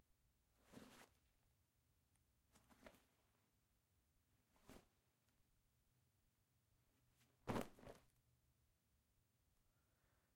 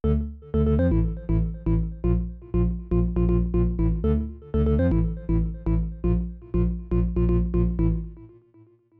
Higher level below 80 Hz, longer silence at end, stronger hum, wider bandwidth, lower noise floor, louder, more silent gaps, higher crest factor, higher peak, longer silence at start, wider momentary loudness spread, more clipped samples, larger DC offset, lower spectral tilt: second, -78 dBFS vs -28 dBFS; first, 2.25 s vs 0.7 s; neither; first, 16 kHz vs 3.6 kHz; first, -84 dBFS vs -55 dBFS; second, -55 LUFS vs -25 LUFS; neither; first, 30 dB vs 12 dB; second, -32 dBFS vs -10 dBFS; first, 0.65 s vs 0.05 s; first, 19 LU vs 6 LU; neither; neither; second, -5.5 dB/octave vs -12.5 dB/octave